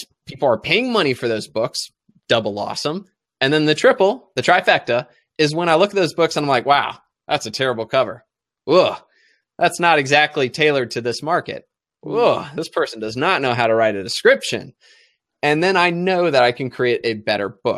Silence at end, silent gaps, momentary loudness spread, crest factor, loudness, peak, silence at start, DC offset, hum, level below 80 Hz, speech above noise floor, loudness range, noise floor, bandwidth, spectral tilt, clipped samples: 0 s; none; 10 LU; 18 dB; -18 LUFS; 0 dBFS; 0 s; under 0.1%; none; -62 dBFS; 42 dB; 3 LU; -60 dBFS; 14 kHz; -4.5 dB/octave; under 0.1%